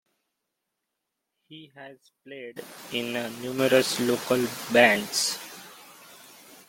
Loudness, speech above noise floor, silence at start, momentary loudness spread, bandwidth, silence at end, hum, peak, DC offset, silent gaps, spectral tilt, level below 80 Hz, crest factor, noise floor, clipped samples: -24 LUFS; 57 dB; 1.5 s; 25 LU; 17 kHz; 0.15 s; none; -4 dBFS; under 0.1%; none; -3 dB/octave; -70 dBFS; 24 dB; -83 dBFS; under 0.1%